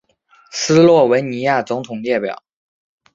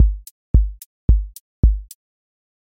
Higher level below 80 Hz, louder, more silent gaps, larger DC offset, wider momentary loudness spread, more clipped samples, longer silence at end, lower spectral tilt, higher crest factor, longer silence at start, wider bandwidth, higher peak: second, -60 dBFS vs -20 dBFS; first, -15 LUFS vs -21 LUFS; second, none vs 0.31-0.54 s, 0.86-1.08 s, 1.40-1.63 s; neither; first, 16 LU vs 11 LU; neither; about the same, 0.8 s vs 0.85 s; second, -5 dB/octave vs -8.5 dB/octave; about the same, 16 dB vs 16 dB; first, 0.55 s vs 0 s; second, 7.8 kHz vs 16 kHz; about the same, -2 dBFS vs -2 dBFS